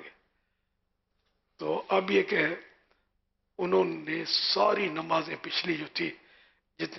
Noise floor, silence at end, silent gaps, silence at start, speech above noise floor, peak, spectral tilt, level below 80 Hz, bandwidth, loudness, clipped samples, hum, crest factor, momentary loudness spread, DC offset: -79 dBFS; 0 s; none; 0 s; 50 dB; -12 dBFS; -5 dB/octave; -72 dBFS; 6.2 kHz; -29 LUFS; under 0.1%; none; 20 dB; 11 LU; under 0.1%